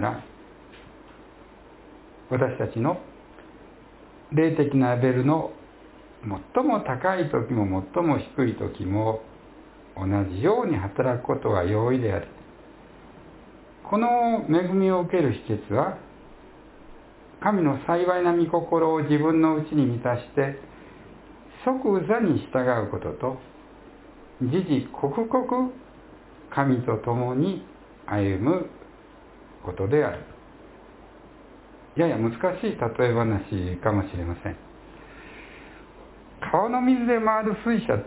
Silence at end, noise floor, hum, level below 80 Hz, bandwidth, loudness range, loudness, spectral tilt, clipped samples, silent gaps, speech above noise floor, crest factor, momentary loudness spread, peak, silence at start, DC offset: 0 s; -49 dBFS; none; -48 dBFS; 4 kHz; 5 LU; -25 LUFS; -12 dB/octave; under 0.1%; none; 25 dB; 20 dB; 15 LU; -6 dBFS; 0 s; under 0.1%